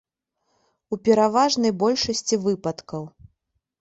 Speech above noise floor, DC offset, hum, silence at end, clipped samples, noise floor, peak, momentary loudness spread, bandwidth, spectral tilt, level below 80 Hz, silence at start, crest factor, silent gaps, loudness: 53 dB; under 0.1%; none; 0.75 s; under 0.1%; -75 dBFS; -6 dBFS; 16 LU; 8.2 kHz; -4 dB/octave; -58 dBFS; 0.9 s; 18 dB; none; -21 LUFS